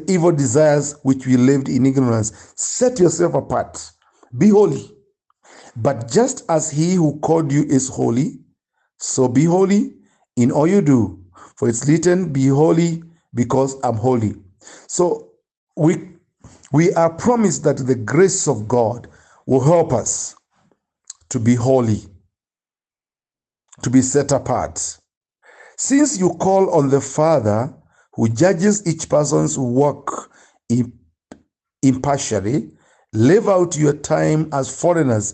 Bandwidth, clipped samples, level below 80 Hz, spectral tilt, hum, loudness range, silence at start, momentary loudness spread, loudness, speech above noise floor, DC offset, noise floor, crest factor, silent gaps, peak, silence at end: 9.2 kHz; under 0.1%; -54 dBFS; -6 dB/octave; none; 4 LU; 0 s; 11 LU; -17 LUFS; over 74 dB; under 0.1%; under -90 dBFS; 16 dB; 15.57-15.67 s, 25.17-25.21 s; -2 dBFS; 0 s